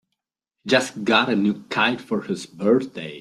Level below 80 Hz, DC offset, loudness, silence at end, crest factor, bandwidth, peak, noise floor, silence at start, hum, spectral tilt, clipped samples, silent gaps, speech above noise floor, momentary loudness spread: -66 dBFS; under 0.1%; -21 LUFS; 0 s; 20 dB; 13.5 kHz; -2 dBFS; -82 dBFS; 0.65 s; none; -4.5 dB/octave; under 0.1%; none; 61 dB; 10 LU